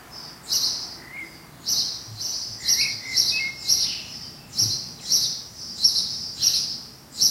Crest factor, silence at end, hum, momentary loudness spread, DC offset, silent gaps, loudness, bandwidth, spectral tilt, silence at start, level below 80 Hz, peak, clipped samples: 22 dB; 0 s; none; 16 LU; under 0.1%; none; -22 LUFS; 16 kHz; 1 dB/octave; 0 s; -58 dBFS; -4 dBFS; under 0.1%